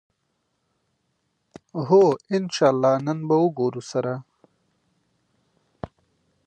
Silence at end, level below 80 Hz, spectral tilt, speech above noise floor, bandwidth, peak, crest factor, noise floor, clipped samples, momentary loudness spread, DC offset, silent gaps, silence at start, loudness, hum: 0.6 s; -64 dBFS; -6.5 dB/octave; 53 dB; 9 kHz; -6 dBFS; 18 dB; -74 dBFS; under 0.1%; 22 LU; under 0.1%; none; 1.75 s; -21 LUFS; none